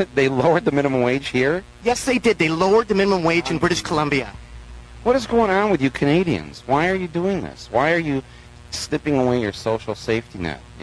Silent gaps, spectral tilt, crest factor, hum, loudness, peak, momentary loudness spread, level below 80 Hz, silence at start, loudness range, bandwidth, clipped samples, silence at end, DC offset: none; -5.5 dB/octave; 18 dB; none; -20 LUFS; -2 dBFS; 8 LU; -44 dBFS; 0 s; 4 LU; 11 kHz; under 0.1%; 0 s; under 0.1%